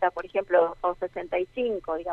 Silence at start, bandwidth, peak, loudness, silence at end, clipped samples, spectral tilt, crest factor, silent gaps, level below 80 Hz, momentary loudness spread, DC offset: 0 s; 5.4 kHz; -8 dBFS; -27 LUFS; 0 s; under 0.1%; -6.5 dB/octave; 20 dB; none; -56 dBFS; 8 LU; under 0.1%